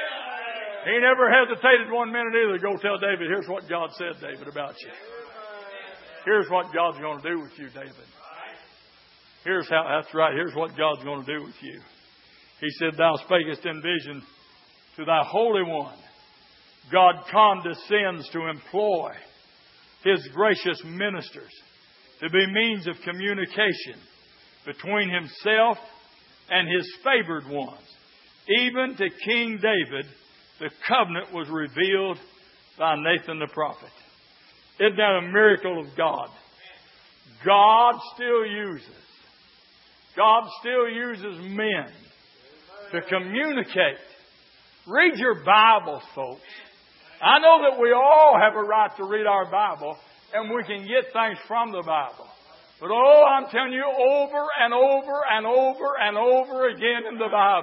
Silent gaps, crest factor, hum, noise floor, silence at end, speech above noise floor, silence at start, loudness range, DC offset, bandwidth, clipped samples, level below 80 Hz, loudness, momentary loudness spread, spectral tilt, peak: none; 22 dB; none; -56 dBFS; 0 s; 33 dB; 0 s; 9 LU; under 0.1%; 5.8 kHz; under 0.1%; -76 dBFS; -22 LUFS; 19 LU; -8.5 dB/octave; -2 dBFS